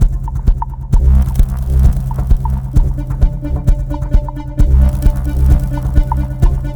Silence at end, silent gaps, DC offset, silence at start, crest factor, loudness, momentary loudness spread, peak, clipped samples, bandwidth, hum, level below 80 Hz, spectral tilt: 0 s; none; under 0.1%; 0 s; 12 dB; -16 LUFS; 6 LU; 0 dBFS; under 0.1%; 19 kHz; none; -12 dBFS; -8.5 dB/octave